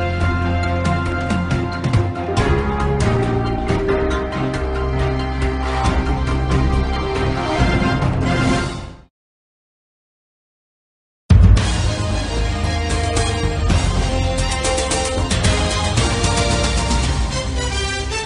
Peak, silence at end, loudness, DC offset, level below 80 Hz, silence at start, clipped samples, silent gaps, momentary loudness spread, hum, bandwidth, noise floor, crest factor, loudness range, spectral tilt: -2 dBFS; 0 s; -19 LUFS; under 0.1%; -22 dBFS; 0 s; under 0.1%; 9.10-11.29 s; 4 LU; none; 11 kHz; under -90 dBFS; 16 dB; 3 LU; -5 dB/octave